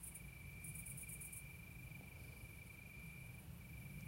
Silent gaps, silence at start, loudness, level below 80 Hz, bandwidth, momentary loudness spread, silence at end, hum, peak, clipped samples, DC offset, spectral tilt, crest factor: none; 0 s; -53 LUFS; -62 dBFS; 16 kHz; 6 LU; 0 s; none; -38 dBFS; under 0.1%; under 0.1%; -4 dB/octave; 16 dB